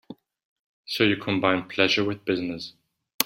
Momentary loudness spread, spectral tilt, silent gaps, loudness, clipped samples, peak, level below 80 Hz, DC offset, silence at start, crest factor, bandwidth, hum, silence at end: 11 LU; -4 dB/octave; 0.45-0.84 s, 3.14-3.19 s; -24 LUFS; under 0.1%; 0 dBFS; -66 dBFS; under 0.1%; 0.1 s; 26 dB; 16.5 kHz; none; 0 s